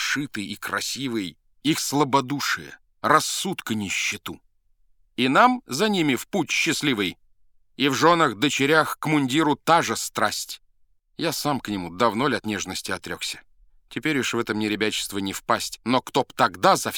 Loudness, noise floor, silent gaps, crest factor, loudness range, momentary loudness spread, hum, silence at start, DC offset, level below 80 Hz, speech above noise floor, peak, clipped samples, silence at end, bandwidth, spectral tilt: -23 LUFS; -61 dBFS; none; 24 dB; 5 LU; 11 LU; none; 0 s; under 0.1%; -60 dBFS; 38 dB; 0 dBFS; under 0.1%; 0 s; 19.5 kHz; -3.5 dB/octave